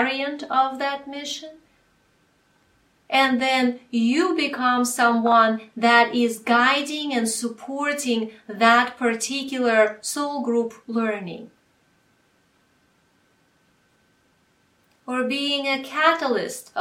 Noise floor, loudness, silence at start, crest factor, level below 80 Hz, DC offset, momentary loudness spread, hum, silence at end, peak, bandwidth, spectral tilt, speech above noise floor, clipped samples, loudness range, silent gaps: -63 dBFS; -21 LUFS; 0 s; 22 dB; -72 dBFS; under 0.1%; 13 LU; none; 0 s; -2 dBFS; 16 kHz; -2.5 dB/octave; 42 dB; under 0.1%; 11 LU; none